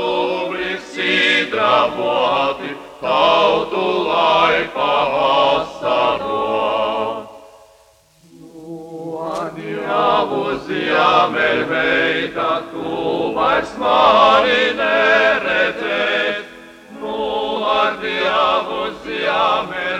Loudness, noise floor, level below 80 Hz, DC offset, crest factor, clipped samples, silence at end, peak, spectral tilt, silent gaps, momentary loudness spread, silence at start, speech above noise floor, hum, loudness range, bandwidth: -16 LUFS; -52 dBFS; -52 dBFS; under 0.1%; 18 dB; under 0.1%; 0 s; 0 dBFS; -4 dB/octave; none; 12 LU; 0 s; 36 dB; none; 8 LU; 12.5 kHz